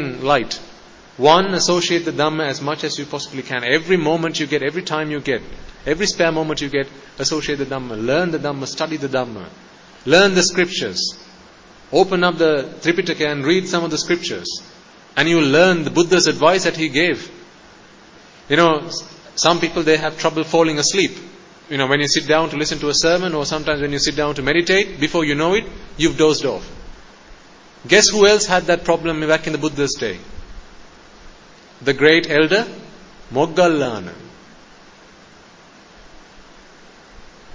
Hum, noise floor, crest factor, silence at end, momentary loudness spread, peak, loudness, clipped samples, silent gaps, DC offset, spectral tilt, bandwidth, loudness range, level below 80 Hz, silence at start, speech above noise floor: none; -45 dBFS; 18 dB; 0 s; 13 LU; 0 dBFS; -17 LUFS; under 0.1%; none; under 0.1%; -3.5 dB/octave; 7.6 kHz; 5 LU; -46 dBFS; 0 s; 28 dB